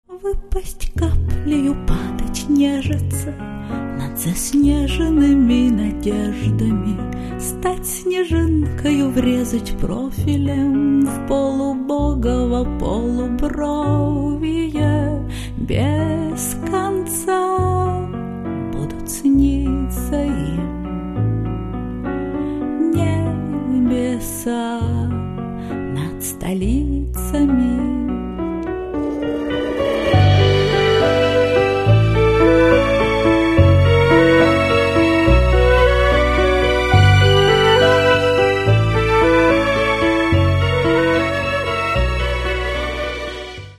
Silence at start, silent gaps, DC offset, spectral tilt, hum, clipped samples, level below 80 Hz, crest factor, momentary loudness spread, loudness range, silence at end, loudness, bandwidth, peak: 0.1 s; none; under 0.1%; -6 dB/octave; none; under 0.1%; -26 dBFS; 16 dB; 12 LU; 7 LU; 0.05 s; -17 LUFS; 13.5 kHz; 0 dBFS